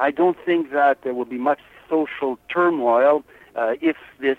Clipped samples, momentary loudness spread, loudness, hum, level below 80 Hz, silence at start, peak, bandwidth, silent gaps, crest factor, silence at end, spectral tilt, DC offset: under 0.1%; 9 LU; -21 LUFS; none; -64 dBFS; 0 s; -6 dBFS; 4.1 kHz; none; 14 dB; 0.05 s; -7 dB/octave; under 0.1%